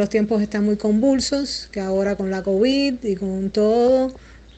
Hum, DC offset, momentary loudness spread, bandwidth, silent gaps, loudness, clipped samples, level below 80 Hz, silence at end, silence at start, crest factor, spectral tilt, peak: none; under 0.1%; 7 LU; 8.8 kHz; none; -20 LUFS; under 0.1%; -46 dBFS; 0.2 s; 0 s; 12 dB; -5.5 dB/octave; -6 dBFS